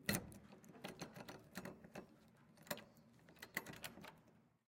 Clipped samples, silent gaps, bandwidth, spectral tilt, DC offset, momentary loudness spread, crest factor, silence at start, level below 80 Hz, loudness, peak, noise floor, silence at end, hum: under 0.1%; none; 16.5 kHz; -3.5 dB/octave; under 0.1%; 18 LU; 30 dB; 0 s; -74 dBFS; -52 LUFS; -22 dBFS; -71 dBFS; 0.2 s; none